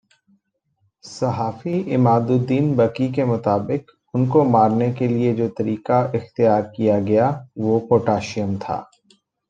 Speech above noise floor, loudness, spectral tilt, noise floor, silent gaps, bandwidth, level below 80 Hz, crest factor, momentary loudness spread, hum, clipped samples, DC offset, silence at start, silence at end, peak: 49 dB; -20 LUFS; -8.5 dB/octave; -68 dBFS; none; 8.6 kHz; -60 dBFS; 18 dB; 9 LU; none; under 0.1%; under 0.1%; 1.05 s; 0.65 s; -2 dBFS